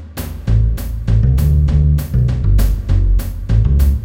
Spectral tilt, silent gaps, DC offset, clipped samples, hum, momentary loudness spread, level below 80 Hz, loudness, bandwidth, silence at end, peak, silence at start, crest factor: -8 dB/octave; none; under 0.1%; under 0.1%; none; 6 LU; -14 dBFS; -16 LUFS; 17 kHz; 0 s; -2 dBFS; 0 s; 12 dB